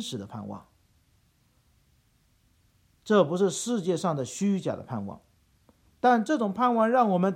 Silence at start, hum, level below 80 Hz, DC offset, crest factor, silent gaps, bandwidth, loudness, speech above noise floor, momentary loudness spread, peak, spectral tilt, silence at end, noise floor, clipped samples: 0 s; none; -70 dBFS; under 0.1%; 18 dB; none; 13.5 kHz; -26 LUFS; 40 dB; 16 LU; -10 dBFS; -5.5 dB/octave; 0 s; -66 dBFS; under 0.1%